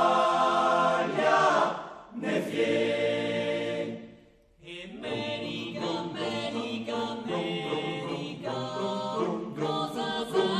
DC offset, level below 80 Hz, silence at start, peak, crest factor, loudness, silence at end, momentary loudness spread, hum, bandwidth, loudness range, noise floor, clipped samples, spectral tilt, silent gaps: under 0.1%; -68 dBFS; 0 s; -10 dBFS; 20 dB; -29 LUFS; 0 s; 11 LU; none; 14 kHz; 8 LU; -57 dBFS; under 0.1%; -5 dB/octave; none